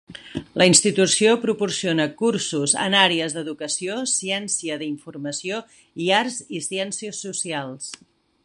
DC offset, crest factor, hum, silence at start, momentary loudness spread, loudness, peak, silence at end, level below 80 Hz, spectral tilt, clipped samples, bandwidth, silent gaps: under 0.1%; 20 dB; none; 0.1 s; 15 LU; -21 LUFS; -2 dBFS; 0.5 s; -62 dBFS; -2.5 dB/octave; under 0.1%; 11.5 kHz; none